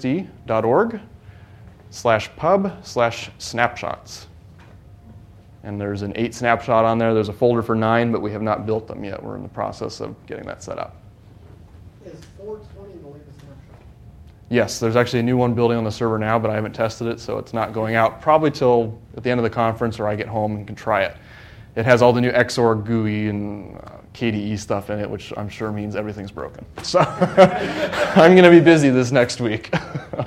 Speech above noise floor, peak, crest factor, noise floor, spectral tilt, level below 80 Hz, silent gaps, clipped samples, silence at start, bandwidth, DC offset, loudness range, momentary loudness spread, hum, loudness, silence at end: 25 dB; 0 dBFS; 20 dB; -44 dBFS; -6 dB/octave; -50 dBFS; none; under 0.1%; 0 s; 14 kHz; under 0.1%; 17 LU; 18 LU; none; -19 LUFS; 0 s